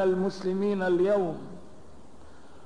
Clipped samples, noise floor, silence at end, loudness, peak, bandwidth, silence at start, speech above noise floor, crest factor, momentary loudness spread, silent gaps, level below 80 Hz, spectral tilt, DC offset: under 0.1%; -52 dBFS; 0.65 s; -27 LUFS; -16 dBFS; 10 kHz; 0 s; 26 dB; 14 dB; 19 LU; none; -60 dBFS; -7.5 dB/octave; 0.7%